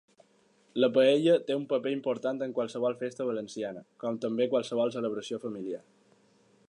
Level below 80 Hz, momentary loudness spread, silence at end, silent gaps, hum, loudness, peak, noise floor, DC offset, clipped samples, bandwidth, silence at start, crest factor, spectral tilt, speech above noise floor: -82 dBFS; 14 LU; 0.9 s; none; none; -30 LUFS; -12 dBFS; -66 dBFS; under 0.1%; under 0.1%; 10.5 kHz; 0.75 s; 18 dB; -5.5 dB/octave; 37 dB